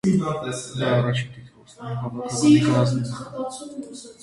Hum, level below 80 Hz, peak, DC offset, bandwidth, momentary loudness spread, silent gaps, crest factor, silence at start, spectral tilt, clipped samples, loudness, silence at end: none; -56 dBFS; -6 dBFS; under 0.1%; 11.5 kHz; 19 LU; none; 18 dB; 0.05 s; -6 dB/octave; under 0.1%; -23 LUFS; 0.1 s